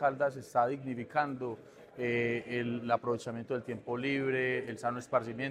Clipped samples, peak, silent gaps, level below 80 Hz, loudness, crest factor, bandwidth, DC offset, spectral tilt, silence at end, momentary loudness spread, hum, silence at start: under 0.1%; -14 dBFS; none; -72 dBFS; -34 LUFS; 18 dB; 13.5 kHz; under 0.1%; -6.5 dB/octave; 0 s; 7 LU; none; 0 s